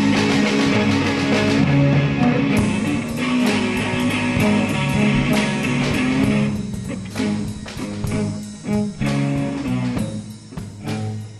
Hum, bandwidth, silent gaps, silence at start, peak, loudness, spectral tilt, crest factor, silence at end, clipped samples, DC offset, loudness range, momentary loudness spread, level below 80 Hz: none; 13.5 kHz; none; 0 s; -4 dBFS; -20 LUFS; -6 dB/octave; 14 dB; 0 s; under 0.1%; under 0.1%; 6 LU; 11 LU; -40 dBFS